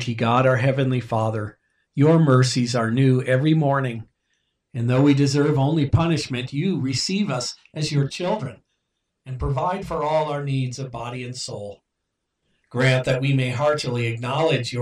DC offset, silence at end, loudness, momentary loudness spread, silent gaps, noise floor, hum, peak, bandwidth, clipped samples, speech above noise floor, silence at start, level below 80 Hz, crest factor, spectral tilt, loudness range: under 0.1%; 0 s; -21 LUFS; 13 LU; none; -78 dBFS; none; -6 dBFS; 10.5 kHz; under 0.1%; 57 dB; 0 s; -46 dBFS; 16 dB; -6 dB/octave; 7 LU